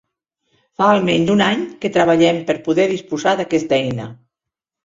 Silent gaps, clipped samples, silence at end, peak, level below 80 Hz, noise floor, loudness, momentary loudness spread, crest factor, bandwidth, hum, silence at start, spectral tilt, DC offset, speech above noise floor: none; under 0.1%; 0.7 s; -2 dBFS; -54 dBFS; -84 dBFS; -17 LUFS; 7 LU; 16 dB; 7.8 kHz; none; 0.8 s; -5.5 dB/octave; under 0.1%; 68 dB